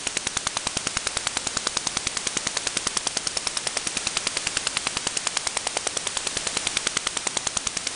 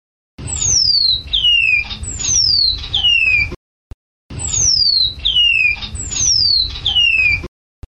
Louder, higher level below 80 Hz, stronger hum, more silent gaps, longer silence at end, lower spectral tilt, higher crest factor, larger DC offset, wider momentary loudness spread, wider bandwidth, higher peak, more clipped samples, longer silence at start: second, -25 LUFS vs -12 LUFS; second, -52 dBFS vs -34 dBFS; neither; second, none vs 3.56-4.29 s; second, 0 s vs 0.4 s; about the same, 0 dB/octave vs 1 dB/octave; first, 22 dB vs 12 dB; neither; second, 1 LU vs 10 LU; about the same, 11 kHz vs 10 kHz; about the same, -6 dBFS vs -4 dBFS; neither; second, 0 s vs 0.4 s